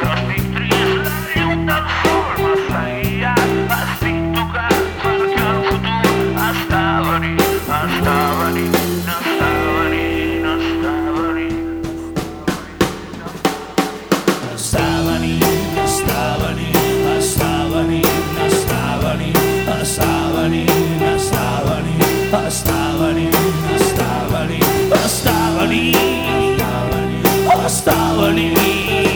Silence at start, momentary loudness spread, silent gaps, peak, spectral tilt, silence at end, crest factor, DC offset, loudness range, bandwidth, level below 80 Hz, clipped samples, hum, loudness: 0 s; 5 LU; none; 0 dBFS; -4.5 dB/octave; 0 s; 16 dB; under 0.1%; 4 LU; over 20 kHz; -32 dBFS; under 0.1%; none; -16 LUFS